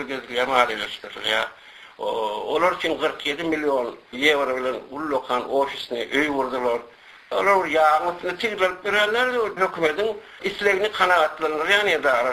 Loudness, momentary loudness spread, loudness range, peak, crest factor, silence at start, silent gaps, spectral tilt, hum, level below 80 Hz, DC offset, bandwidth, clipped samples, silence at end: -22 LUFS; 10 LU; 3 LU; -4 dBFS; 20 dB; 0 s; none; -3 dB/octave; none; -58 dBFS; under 0.1%; 14 kHz; under 0.1%; 0 s